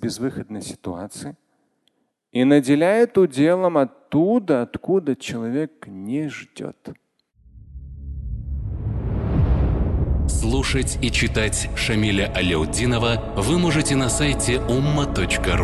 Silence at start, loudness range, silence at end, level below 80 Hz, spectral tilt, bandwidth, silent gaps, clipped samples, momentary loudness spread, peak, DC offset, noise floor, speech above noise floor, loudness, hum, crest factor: 0 s; 11 LU; 0 s; -30 dBFS; -5 dB/octave; 12.5 kHz; none; under 0.1%; 16 LU; -2 dBFS; under 0.1%; -68 dBFS; 48 dB; -21 LUFS; none; 18 dB